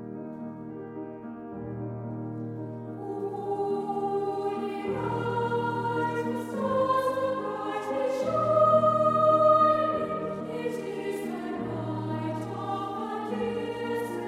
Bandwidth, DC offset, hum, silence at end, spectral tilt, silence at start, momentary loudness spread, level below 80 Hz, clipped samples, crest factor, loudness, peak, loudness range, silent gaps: 14.5 kHz; under 0.1%; none; 0 s; -7 dB/octave; 0 s; 17 LU; -64 dBFS; under 0.1%; 18 dB; -28 LUFS; -10 dBFS; 10 LU; none